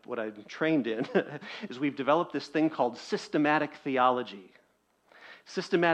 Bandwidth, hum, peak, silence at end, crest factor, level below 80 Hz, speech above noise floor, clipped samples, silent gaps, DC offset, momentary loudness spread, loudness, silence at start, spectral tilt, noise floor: 9 kHz; none; -10 dBFS; 0 s; 20 dB; -78 dBFS; 40 dB; under 0.1%; none; under 0.1%; 13 LU; -30 LUFS; 0.1 s; -6 dB/octave; -69 dBFS